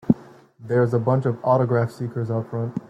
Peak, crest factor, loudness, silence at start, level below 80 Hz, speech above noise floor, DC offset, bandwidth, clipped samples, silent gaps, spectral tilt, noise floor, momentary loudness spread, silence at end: -2 dBFS; 20 dB; -22 LUFS; 0.05 s; -60 dBFS; 25 dB; under 0.1%; 8.4 kHz; under 0.1%; none; -10 dB/octave; -47 dBFS; 7 LU; 0.1 s